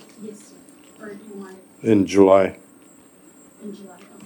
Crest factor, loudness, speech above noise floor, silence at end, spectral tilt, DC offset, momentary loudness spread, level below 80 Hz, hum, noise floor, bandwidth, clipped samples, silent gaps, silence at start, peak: 22 dB; -17 LUFS; 29 dB; 0.4 s; -6.5 dB/octave; under 0.1%; 26 LU; -66 dBFS; none; -50 dBFS; 18.5 kHz; under 0.1%; none; 0.2 s; 0 dBFS